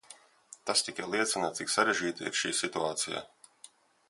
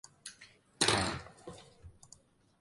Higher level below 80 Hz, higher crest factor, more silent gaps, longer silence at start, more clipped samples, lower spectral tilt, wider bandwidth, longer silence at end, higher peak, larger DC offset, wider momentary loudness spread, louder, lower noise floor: second, -74 dBFS vs -58 dBFS; about the same, 24 dB vs 26 dB; neither; second, 0.1 s vs 0.25 s; neither; about the same, -1.5 dB/octave vs -2.5 dB/octave; about the same, 12 kHz vs 12 kHz; second, 0.45 s vs 0.7 s; about the same, -10 dBFS vs -12 dBFS; neither; second, 6 LU vs 24 LU; about the same, -31 LUFS vs -32 LUFS; second, -58 dBFS vs -63 dBFS